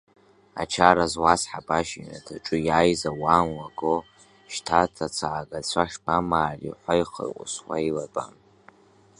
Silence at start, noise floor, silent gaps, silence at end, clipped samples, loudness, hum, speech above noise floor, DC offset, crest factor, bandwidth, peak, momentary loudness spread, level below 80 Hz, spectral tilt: 0.55 s; -57 dBFS; none; 0.9 s; under 0.1%; -25 LUFS; none; 32 dB; under 0.1%; 24 dB; 11.5 kHz; 0 dBFS; 13 LU; -50 dBFS; -4 dB/octave